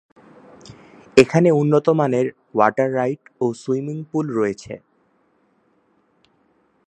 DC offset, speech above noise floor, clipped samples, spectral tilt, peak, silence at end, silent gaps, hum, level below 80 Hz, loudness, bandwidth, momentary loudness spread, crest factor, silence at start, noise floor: under 0.1%; 44 dB; under 0.1%; -7 dB/octave; 0 dBFS; 2.1 s; none; none; -60 dBFS; -19 LUFS; 11 kHz; 10 LU; 20 dB; 0.7 s; -62 dBFS